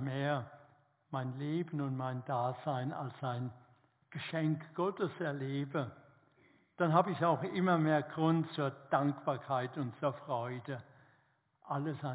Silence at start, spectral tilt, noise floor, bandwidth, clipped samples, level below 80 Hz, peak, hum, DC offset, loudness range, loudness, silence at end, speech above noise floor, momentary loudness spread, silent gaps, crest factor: 0 s; -6.5 dB/octave; -73 dBFS; 4 kHz; under 0.1%; -78 dBFS; -14 dBFS; none; under 0.1%; 6 LU; -36 LUFS; 0 s; 38 dB; 11 LU; none; 22 dB